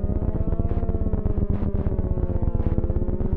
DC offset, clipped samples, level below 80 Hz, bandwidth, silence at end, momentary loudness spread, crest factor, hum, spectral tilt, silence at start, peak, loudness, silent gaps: under 0.1%; under 0.1%; -26 dBFS; 2.8 kHz; 0 s; 1 LU; 16 dB; none; -13 dB/octave; 0 s; -6 dBFS; -26 LUFS; none